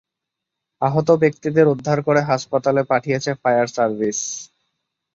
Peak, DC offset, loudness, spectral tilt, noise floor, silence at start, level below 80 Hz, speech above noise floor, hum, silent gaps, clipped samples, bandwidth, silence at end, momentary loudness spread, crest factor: -2 dBFS; under 0.1%; -19 LUFS; -5.5 dB/octave; -83 dBFS; 0.8 s; -60 dBFS; 64 dB; none; none; under 0.1%; 8 kHz; 0.7 s; 6 LU; 18 dB